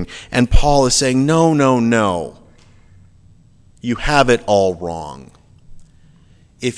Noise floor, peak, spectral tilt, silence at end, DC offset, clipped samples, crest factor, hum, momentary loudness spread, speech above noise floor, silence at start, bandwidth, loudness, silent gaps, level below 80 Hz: -48 dBFS; 0 dBFS; -5 dB/octave; 0 s; under 0.1%; under 0.1%; 16 dB; none; 14 LU; 34 dB; 0 s; 11 kHz; -15 LUFS; none; -26 dBFS